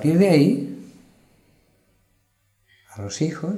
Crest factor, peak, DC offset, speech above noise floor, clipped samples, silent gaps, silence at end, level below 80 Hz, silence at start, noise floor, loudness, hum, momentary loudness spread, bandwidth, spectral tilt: 20 dB; -4 dBFS; under 0.1%; 48 dB; under 0.1%; none; 0 s; -66 dBFS; 0 s; -67 dBFS; -20 LUFS; none; 23 LU; 14 kHz; -7 dB/octave